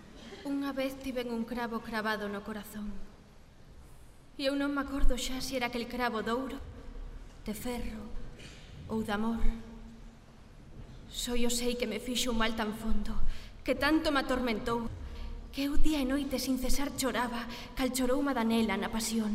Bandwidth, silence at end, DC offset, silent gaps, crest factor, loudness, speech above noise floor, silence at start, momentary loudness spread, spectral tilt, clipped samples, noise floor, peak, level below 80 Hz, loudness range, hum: 16 kHz; 0 s; under 0.1%; none; 20 dB; -33 LUFS; 25 dB; 0 s; 19 LU; -4 dB/octave; under 0.1%; -54 dBFS; -10 dBFS; -38 dBFS; 7 LU; none